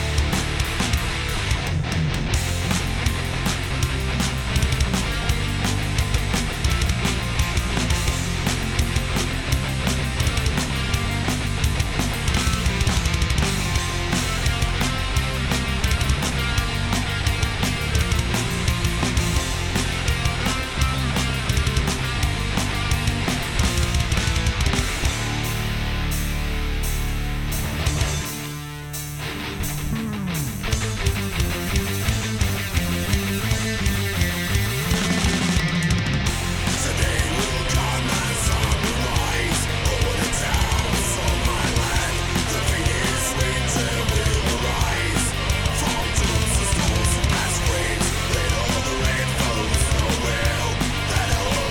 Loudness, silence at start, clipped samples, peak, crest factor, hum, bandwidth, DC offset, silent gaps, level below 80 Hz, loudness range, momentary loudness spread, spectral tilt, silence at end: -22 LUFS; 0 s; under 0.1%; -10 dBFS; 12 dB; none; 19 kHz; under 0.1%; none; -26 dBFS; 3 LU; 3 LU; -4 dB/octave; 0 s